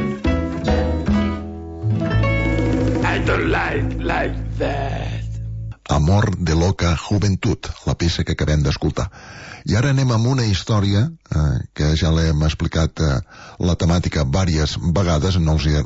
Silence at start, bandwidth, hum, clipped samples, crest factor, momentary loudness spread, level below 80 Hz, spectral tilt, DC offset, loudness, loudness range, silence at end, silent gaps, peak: 0 s; 8 kHz; none; under 0.1%; 12 dB; 8 LU; -28 dBFS; -6 dB/octave; under 0.1%; -20 LUFS; 2 LU; 0 s; none; -6 dBFS